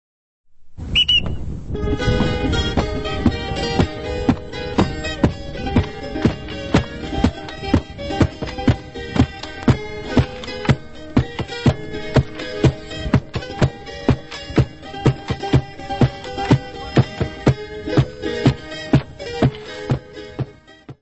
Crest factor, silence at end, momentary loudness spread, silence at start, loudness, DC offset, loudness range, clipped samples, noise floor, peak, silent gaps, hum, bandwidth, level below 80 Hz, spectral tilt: 20 dB; 0.1 s; 8 LU; 0.5 s; -21 LUFS; under 0.1%; 2 LU; under 0.1%; -42 dBFS; 0 dBFS; none; none; 8.4 kHz; -32 dBFS; -6.5 dB/octave